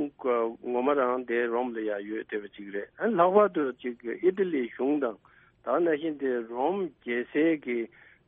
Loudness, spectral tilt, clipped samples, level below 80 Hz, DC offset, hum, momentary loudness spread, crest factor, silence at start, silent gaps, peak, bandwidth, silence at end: -28 LUFS; -4.5 dB/octave; under 0.1%; -72 dBFS; under 0.1%; none; 11 LU; 18 dB; 0 s; none; -10 dBFS; 3.8 kHz; 0.4 s